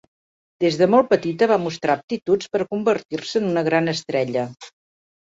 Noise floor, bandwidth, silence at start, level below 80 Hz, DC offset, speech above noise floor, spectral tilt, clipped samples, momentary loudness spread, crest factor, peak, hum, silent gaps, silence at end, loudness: under -90 dBFS; 8 kHz; 0.6 s; -64 dBFS; under 0.1%; over 70 dB; -5.5 dB/octave; under 0.1%; 8 LU; 18 dB; -4 dBFS; none; 2.04-2.08 s, 2.22-2.26 s, 3.05-3.09 s; 0.55 s; -21 LUFS